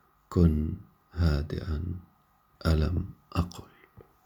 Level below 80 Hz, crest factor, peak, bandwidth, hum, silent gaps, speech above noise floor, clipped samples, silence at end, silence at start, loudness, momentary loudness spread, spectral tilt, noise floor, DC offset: -36 dBFS; 20 dB; -10 dBFS; 12.5 kHz; none; none; 38 dB; under 0.1%; 0.25 s; 0.3 s; -30 LUFS; 17 LU; -8 dB/octave; -65 dBFS; under 0.1%